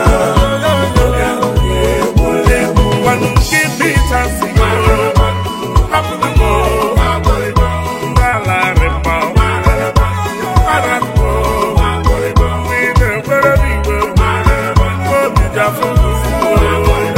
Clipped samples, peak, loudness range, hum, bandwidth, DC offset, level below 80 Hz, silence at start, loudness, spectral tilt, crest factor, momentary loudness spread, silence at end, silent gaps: under 0.1%; 0 dBFS; 1 LU; none; 16.5 kHz; under 0.1%; -16 dBFS; 0 s; -12 LUFS; -5.5 dB/octave; 12 dB; 3 LU; 0 s; none